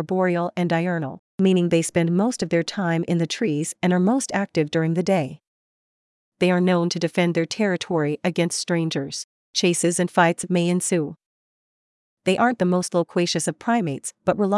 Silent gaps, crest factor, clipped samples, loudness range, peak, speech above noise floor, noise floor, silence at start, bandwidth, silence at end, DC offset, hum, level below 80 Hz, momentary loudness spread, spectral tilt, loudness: 1.19-1.38 s, 5.47-6.32 s, 9.24-9.54 s, 11.26-12.17 s; 18 dB; under 0.1%; 2 LU; -6 dBFS; over 69 dB; under -90 dBFS; 0 s; 12 kHz; 0 s; under 0.1%; none; -66 dBFS; 6 LU; -5 dB/octave; -22 LUFS